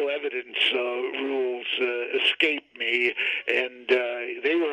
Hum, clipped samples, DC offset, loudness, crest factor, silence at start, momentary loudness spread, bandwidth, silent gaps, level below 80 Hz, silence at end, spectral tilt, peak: none; under 0.1%; under 0.1%; -25 LUFS; 20 dB; 0 s; 6 LU; 9.8 kHz; none; -76 dBFS; 0 s; -2.5 dB/octave; -6 dBFS